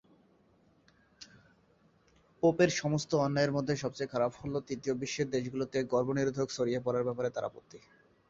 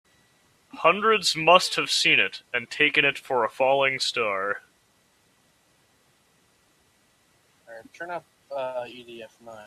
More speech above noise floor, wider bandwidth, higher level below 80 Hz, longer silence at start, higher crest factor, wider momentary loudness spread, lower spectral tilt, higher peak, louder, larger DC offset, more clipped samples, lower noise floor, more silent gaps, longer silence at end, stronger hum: second, 35 dB vs 40 dB; second, 7.8 kHz vs 14 kHz; first, -66 dBFS vs -72 dBFS; first, 1.2 s vs 0.75 s; about the same, 20 dB vs 24 dB; second, 10 LU vs 20 LU; first, -5.5 dB/octave vs -2 dB/octave; second, -14 dBFS vs -2 dBFS; second, -32 LUFS vs -22 LUFS; neither; neither; about the same, -67 dBFS vs -64 dBFS; neither; first, 0.5 s vs 0 s; neither